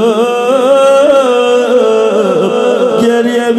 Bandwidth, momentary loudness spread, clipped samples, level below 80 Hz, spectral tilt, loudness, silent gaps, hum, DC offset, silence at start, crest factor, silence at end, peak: 13 kHz; 4 LU; 0.4%; -58 dBFS; -4.5 dB/octave; -9 LUFS; none; none; under 0.1%; 0 s; 8 dB; 0 s; 0 dBFS